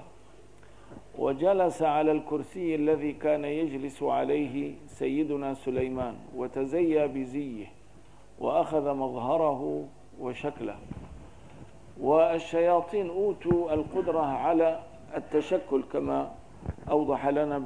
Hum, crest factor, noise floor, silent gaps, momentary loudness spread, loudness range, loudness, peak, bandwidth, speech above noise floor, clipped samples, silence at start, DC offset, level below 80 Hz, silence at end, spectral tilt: none; 18 dB; -55 dBFS; none; 14 LU; 4 LU; -29 LUFS; -10 dBFS; 10.5 kHz; 27 dB; under 0.1%; 0 s; 0.3%; -56 dBFS; 0 s; -7.5 dB/octave